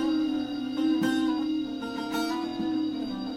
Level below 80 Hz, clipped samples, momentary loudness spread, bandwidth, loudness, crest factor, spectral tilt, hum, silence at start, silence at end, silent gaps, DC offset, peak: -60 dBFS; under 0.1%; 6 LU; 15 kHz; -29 LUFS; 12 dB; -5 dB/octave; none; 0 s; 0 s; none; under 0.1%; -16 dBFS